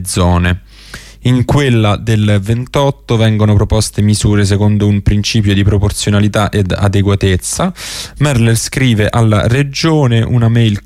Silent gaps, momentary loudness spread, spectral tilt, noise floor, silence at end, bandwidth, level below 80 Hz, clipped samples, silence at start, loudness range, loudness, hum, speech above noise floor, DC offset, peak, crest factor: none; 5 LU; -5.5 dB/octave; -32 dBFS; 0.05 s; 14.5 kHz; -28 dBFS; under 0.1%; 0 s; 1 LU; -12 LUFS; none; 22 dB; under 0.1%; 0 dBFS; 10 dB